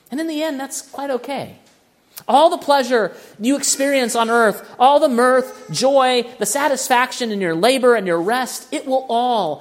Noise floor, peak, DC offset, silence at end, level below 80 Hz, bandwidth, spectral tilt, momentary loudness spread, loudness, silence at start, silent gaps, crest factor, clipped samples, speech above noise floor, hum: -55 dBFS; 0 dBFS; under 0.1%; 0 s; -72 dBFS; 16.5 kHz; -3 dB/octave; 11 LU; -17 LUFS; 0.1 s; none; 18 dB; under 0.1%; 38 dB; none